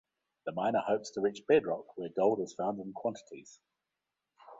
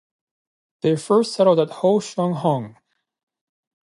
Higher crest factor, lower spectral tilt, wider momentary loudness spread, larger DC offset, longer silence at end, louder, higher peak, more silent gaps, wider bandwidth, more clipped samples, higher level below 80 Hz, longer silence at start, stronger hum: about the same, 22 dB vs 18 dB; about the same, -5.5 dB/octave vs -6.5 dB/octave; first, 15 LU vs 8 LU; neither; second, 0.05 s vs 1.15 s; second, -33 LUFS vs -20 LUFS; second, -12 dBFS vs -4 dBFS; neither; second, 7.8 kHz vs 11.5 kHz; neither; about the same, -76 dBFS vs -72 dBFS; second, 0.45 s vs 0.85 s; neither